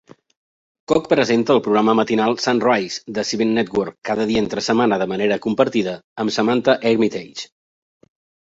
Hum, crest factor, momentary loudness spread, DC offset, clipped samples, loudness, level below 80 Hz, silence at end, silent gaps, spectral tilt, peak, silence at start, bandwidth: none; 18 dB; 8 LU; under 0.1%; under 0.1%; -19 LUFS; -56 dBFS; 1.05 s; 6.04-6.16 s; -5 dB/octave; -2 dBFS; 0.9 s; 8 kHz